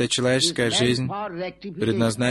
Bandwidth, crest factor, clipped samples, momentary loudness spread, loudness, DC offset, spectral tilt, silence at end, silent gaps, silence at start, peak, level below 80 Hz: 12.5 kHz; 16 dB; under 0.1%; 11 LU; -22 LUFS; under 0.1%; -4 dB/octave; 0 s; none; 0 s; -6 dBFS; -52 dBFS